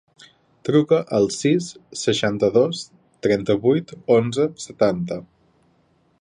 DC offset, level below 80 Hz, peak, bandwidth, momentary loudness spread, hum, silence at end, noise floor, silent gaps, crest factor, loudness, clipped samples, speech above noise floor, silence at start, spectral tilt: under 0.1%; -58 dBFS; -4 dBFS; 11 kHz; 12 LU; none; 0.95 s; -61 dBFS; none; 18 dB; -21 LUFS; under 0.1%; 42 dB; 0.65 s; -5.5 dB/octave